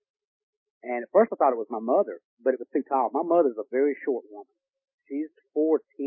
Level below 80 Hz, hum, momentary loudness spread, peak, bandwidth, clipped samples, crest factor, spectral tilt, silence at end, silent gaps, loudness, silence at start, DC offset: -90 dBFS; none; 11 LU; -8 dBFS; 3 kHz; under 0.1%; 20 dB; -11 dB/octave; 0 s; 2.24-2.37 s, 4.94-4.98 s; -26 LUFS; 0.85 s; under 0.1%